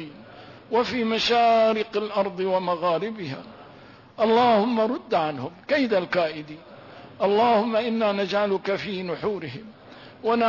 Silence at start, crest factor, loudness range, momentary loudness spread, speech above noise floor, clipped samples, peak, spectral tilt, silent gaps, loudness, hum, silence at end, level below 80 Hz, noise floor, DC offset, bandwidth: 0 s; 14 dB; 1 LU; 16 LU; 25 dB; under 0.1%; -10 dBFS; -5.5 dB/octave; none; -23 LUFS; none; 0 s; -64 dBFS; -48 dBFS; under 0.1%; 6 kHz